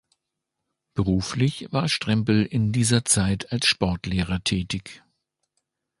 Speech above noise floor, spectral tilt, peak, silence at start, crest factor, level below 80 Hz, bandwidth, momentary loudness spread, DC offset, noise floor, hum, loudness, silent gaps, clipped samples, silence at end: 59 dB; -4.5 dB/octave; -4 dBFS; 0.95 s; 20 dB; -44 dBFS; 12 kHz; 7 LU; under 0.1%; -82 dBFS; none; -23 LUFS; none; under 0.1%; 1.05 s